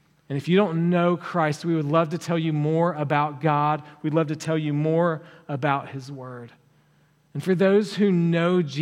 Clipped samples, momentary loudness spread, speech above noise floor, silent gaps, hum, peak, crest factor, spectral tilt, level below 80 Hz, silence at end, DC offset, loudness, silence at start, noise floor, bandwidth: under 0.1%; 14 LU; 38 dB; none; none; -6 dBFS; 18 dB; -7.5 dB/octave; -74 dBFS; 0 s; under 0.1%; -23 LUFS; 0.3 s; -61 dBFS; 11.5 kHz